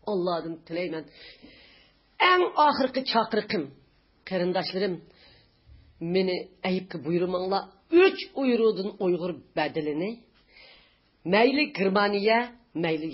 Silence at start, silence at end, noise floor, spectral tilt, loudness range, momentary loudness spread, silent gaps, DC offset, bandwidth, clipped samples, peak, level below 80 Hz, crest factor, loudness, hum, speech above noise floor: 0.05 s; 0 s; -61 dBFS; -9.5 dB/octave; 5 LU; 14 LU; none; under 0.1%; 5.8 kHz; under 0.1%; -8 dBFS; -64 dBFS; 20 dB; -26 LUFS; none; 35 dB